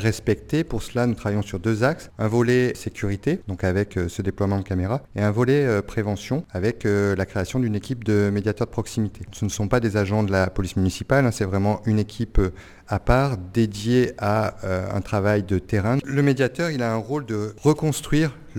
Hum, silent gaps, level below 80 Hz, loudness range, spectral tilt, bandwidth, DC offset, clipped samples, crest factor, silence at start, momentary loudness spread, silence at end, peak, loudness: none; none; -38 dBFS; 1 LU; -6.5 dB/octave; 16.5 kHz; under 0.1%; under 0.1%; 22 dB; 0 s; 7 LU; 0 s; -2 dBFS; -23 LUFS